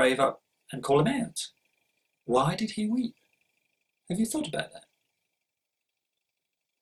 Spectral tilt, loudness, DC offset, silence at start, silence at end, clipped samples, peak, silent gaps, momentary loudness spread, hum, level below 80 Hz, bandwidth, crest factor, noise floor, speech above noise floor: -5 dB/octave; -29 LUFS; under 0.1%; 0 s; 2 s; under 0.1%; -8 dBFS; none; 16 LU; none; -64 dBFS; 14 kHz; 22 dB; -85 dBFS; 58 dB